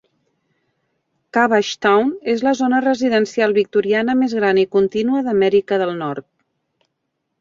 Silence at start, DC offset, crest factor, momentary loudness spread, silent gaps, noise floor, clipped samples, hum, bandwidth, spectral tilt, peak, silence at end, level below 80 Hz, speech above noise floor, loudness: 1.35 s; under 0.1%; 16 dB; 5 LU; none; -74 dBFS; under 0.1%; none; 7.6 kHz; -5.5 dB/octave; -2 dBFS; 1.2 s; -62 dBFS; 58 dB; -17 LUFS